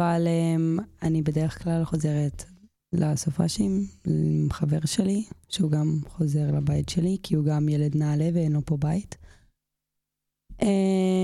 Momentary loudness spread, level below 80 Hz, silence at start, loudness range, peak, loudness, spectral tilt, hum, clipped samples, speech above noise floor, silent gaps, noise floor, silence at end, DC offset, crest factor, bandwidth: 5 LU; -48 dBFS; 0 s; 2 LU; -10 dBFS; -25 LUFS; -7 dB/octave; none; under 0.1%; 60 dB; none; -84 dBFS; 0 s; under 0.1%; 16 dB; 12.5 kHz